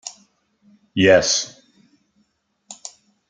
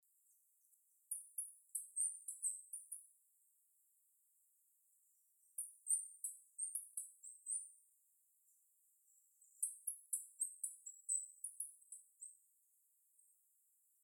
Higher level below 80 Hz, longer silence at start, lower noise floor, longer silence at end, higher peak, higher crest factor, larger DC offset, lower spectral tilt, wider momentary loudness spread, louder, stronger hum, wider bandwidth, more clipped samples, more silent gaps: first, -58 dBFS vs under -90 dBFS; second, 0.05 s vs 1.1 s; second, -67 dBFS vs -78 dBFS; second, 0.55 s vs 1.7 s; first, 0 dBFS vs -24 dBFS; second, 22 dB vs 28 dB; neither; first, -3 dB/octave vs 5 dB/octave; first, 24 LU vs 14 LU; first, -17 LUFS vs -45 LUFS; neither; second, 9.6 kHz vs 19.5 kHz; neither; neither